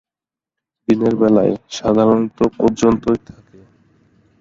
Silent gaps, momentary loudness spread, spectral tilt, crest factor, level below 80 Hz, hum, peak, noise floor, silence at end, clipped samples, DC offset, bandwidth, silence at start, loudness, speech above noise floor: none; 7 LU; -7 dB/octave; 16 dB; -46 dBFS; none; -2 dBFS; -89 dBFS; 1.25 s; under 0.1%; under 0.1%; 7.6 kHz; 0.9 s; -16 LUFS; 74 dB